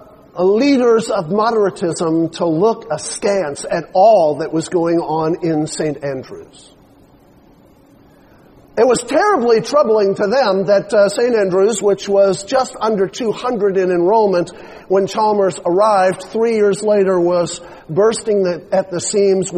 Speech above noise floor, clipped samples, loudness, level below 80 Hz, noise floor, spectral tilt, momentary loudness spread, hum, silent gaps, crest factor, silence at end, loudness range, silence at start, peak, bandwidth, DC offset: 32 dB; under 0.1%; -15 LUFS; -54 dBFS; -47 dBFS; -5 dB/octave; 8 LU; none; none; 14 dB; 0 s; 7 LU; 0.35 s; -2 dBFS; 10.5 kHz; under 0.1%